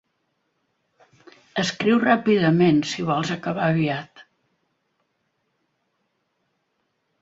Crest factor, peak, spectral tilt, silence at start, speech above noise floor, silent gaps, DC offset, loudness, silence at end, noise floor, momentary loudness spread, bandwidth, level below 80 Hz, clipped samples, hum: 22 dB; -4 dBFS; -6 dB/octave; 1.55 s; 53 dB; none; under 0.1%; -21 LUFS; 3 s; -73 dBFS; 8 LU; 8 kHz; -64 dBFS; under 0.1%; none